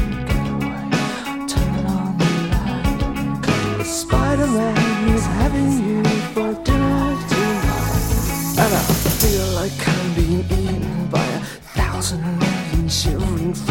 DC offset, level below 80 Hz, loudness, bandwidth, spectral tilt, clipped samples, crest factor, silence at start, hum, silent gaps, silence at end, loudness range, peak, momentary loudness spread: 0.2%; -26 dBFS; -20 LUFS; 17 kHz; -5 dB/octave; under 0.1%; 18 dB; 0 s; none; none; 0 s; 3 LU; 0 dBFS; 5 LU